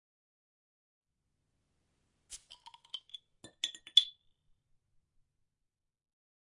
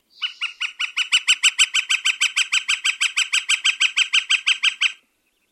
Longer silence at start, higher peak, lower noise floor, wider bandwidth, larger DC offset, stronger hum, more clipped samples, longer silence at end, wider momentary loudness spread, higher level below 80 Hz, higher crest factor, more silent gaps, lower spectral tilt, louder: first, 2.3 s vs 0.2 s; second, -8 dBFS vs -4 dBFS; first, -88 dBFS vs -67 dBFS; second, 11.5 kHz vs 15 kHz; neither; neither; neither; first, 2.5 s vs 0.6 s; first, 24 LU vs 9 LU; first, -80 dBFS vs -88 dBFS; first, 34 dB vs 18 dB; neither; first, 2 dB/octave vs 8.5 dB/octave; second, -30 LUFS vs -18 LUFS